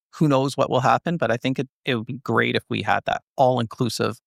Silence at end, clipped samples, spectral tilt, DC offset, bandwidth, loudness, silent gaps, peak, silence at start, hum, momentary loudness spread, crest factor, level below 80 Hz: 0.1 s; under 0.1%; -6 dB/octave; under 0.1%; 15 kHz; -22 LUFS; 1.69-1.84 s, 3.22-3.36 s; -4 dBFS; 0.15 s; none; 6 LU; 18 dB; -60 dBFS